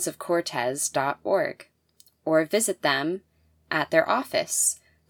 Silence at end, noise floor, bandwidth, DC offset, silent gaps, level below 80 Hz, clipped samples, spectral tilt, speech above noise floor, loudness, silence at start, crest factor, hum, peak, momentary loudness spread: 0.35 s; -61 dBFS; over 20 kHz; under 0.1%; none; -70 dBFS; under 0.1%; -2.5 dB/octave; 36 dB; -25 LUFS; 0 s; 20 dB; none; -6 dBFS; 7 LU